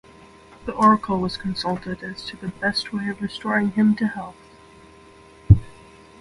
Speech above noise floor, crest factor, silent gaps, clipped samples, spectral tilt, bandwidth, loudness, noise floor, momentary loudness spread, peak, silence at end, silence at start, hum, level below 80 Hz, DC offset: 25 dB; 22 dB; none; under 0.1%; -7 dB/octave; 11.5 kHz; -22 LUFS; -48 dBFS; 15 LU; 0 dBFS; 0.5 s; 0.6 s; none; -36 dBFS; under 0.1%